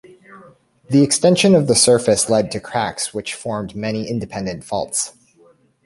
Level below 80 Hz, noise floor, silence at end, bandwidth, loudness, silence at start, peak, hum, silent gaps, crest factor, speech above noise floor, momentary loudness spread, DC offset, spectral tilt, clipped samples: -52 dBFS; -53 dBFS; 0.75 s; 12 kHz; -17 LUFS; 0.3 s; -2 dBFS; none; none; 16 dB; 36 dB; 13 LU; under 0.1%; -4 dB/octave; under 0.1%